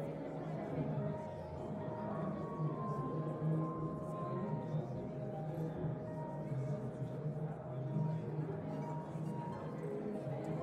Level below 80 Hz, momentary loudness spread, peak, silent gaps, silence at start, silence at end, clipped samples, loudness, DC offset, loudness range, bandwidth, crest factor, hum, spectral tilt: -68 dBFS; 5 LU; -26 dBFS; none; 0 s; 0 s; under 0.1%; -42 LUFS; under 0.1%; 2 LU; 8.8 kHz; 14 dB; none; -9.5 dB/octave